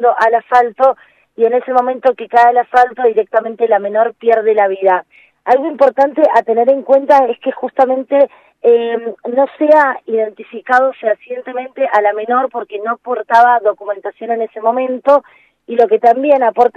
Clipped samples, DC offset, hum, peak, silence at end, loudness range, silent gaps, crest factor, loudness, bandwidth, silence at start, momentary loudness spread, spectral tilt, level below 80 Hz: 0.1%; under 0.1%; none; 0 dBFS; 0.05 s; 3 LU; none; 12 dB; -13 LUFS; 7.6 kHz; 0 s; 10 LU; -5.5 dB/octave; -64 dBFS